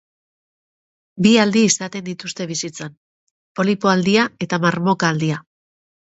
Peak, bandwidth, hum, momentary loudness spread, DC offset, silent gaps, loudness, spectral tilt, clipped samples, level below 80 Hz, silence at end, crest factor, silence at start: -2 dBFS; 8.2 kHz; none; 15 LU; under 0.1%; 2.97-3.55 s; -18 LUFS; -4.5 dB/octave; under 0.1%; -60 dBFS; 0.7 s; 18 dB; 1.15 s